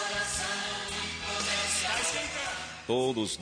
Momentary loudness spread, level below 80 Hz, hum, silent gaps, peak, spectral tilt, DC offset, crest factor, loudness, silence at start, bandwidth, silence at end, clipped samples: 6 LU; -54 dBFS; none; none; -16 dBFS; -1.5 dB/octave; under 0.1%; 16 dB; -30 LUFS; 0 s; 10.5 kHz; 0 s; under 0.1%